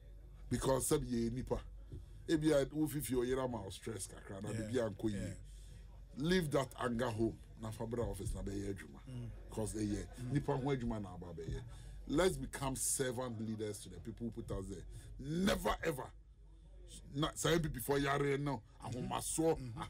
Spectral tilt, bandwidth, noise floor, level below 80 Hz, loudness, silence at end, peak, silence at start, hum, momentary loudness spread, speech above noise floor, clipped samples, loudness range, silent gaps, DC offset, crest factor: -5 dB/octave; 16 kHz; -59 dBFS; -52 dBFS; -39 LUFS; 0 s; -22 dBFS; 0 s; none; 16 LU; 20 dB; under 0.1%; 4 LU; none; under 0.1%; 18 dB